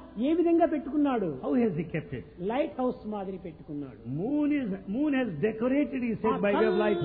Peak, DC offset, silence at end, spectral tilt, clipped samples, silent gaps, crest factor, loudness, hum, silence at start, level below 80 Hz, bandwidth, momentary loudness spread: -14 dBFS; under 0.1%; 0 s; -11 dB/octave; under 0.1%; none; 14 dB; -28 LUFS; none; 0 s; -58 dBFS; 4.5 kHz; 13 LU